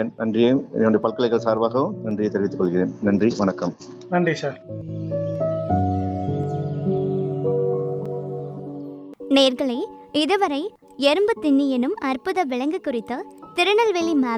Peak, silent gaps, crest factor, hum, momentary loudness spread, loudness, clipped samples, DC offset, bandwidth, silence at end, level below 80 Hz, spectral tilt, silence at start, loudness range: -4 dBFS; none; 18 dB; none; 12 LU; -22 LUFS; under 0.1%; under 0.1%; 13 kHz; 0 s; -58 dBFS; -6.5 dB/octave; 0 s; 4 LU